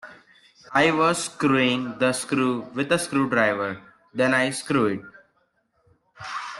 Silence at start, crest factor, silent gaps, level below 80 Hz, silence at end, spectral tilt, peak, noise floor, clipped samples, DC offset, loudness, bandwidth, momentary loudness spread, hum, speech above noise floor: 0.05 s; 18 dB; none; -64 dBFS; 0 s; -4.5 dB/octave; -6 dBFS; -68 dBFS; under 0.1%; under 0.1%; -23 LUFS; 12.5 kHz; 13 LU; none; 46 dB